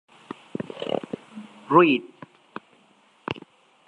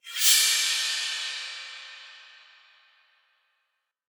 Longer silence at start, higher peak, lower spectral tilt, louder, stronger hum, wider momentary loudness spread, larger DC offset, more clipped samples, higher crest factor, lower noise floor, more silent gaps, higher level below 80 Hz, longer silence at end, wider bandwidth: first, 0.6 s vs 0.05 s; about the same, -4 dBFS vs -6 dBFS; first, -7 dB/octave vs 9.5 dB/octave; about the same, -24 LUFS vs -22 LUFS; neither; about the same, 25 LU vs 23 LU; neither; neither; about the same, 22 dB vs 24 dB; second, -59 dBFS vs -78 dBFS; neither; first, -70 dBFS vs under -90 dBFS; second, 0.5 s vs 1.9 s; second, 9 kHz vs over 20 kHz